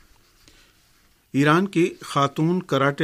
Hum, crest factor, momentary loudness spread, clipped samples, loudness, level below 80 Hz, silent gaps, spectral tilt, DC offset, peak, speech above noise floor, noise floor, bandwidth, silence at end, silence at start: none; 20 dB; 5 LU; under 0.1%; -21 LUFS; -62 dBFS; none; -6 dB/octave; under 0.1%; -4 dBFS; 39 dB; -59 dBFS; 15 kHz; 0 s; 1.35 s